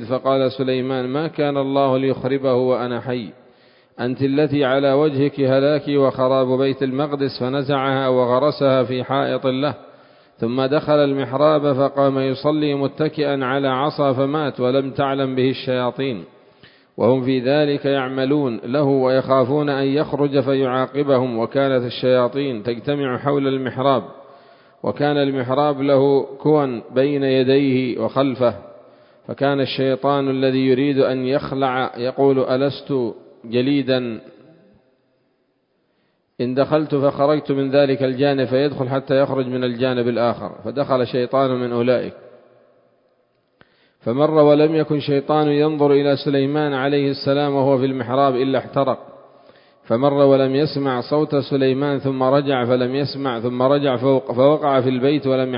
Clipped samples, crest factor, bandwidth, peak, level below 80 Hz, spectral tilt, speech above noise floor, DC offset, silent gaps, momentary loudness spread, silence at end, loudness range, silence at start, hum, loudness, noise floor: under 0.1%; 18 dB; 5.4 kHz; 0 dBFS; -60 dBFS; -12 dB/octave; 48 dB; under 0.1%; none; 6 LU; 0 s; 3 LU; 0 s; none; -19 LUFS; -66 dBFS